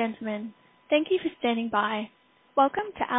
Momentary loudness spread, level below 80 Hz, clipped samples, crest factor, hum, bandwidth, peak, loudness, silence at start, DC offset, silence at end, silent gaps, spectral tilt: 11 LU; -66 dBFS; under 0.1%; 18 dB; none; 3.9 kHz; -10 dBFS; -27 LUFS; 0 s; under 0.1%; 0 s; none; -9 dB/octave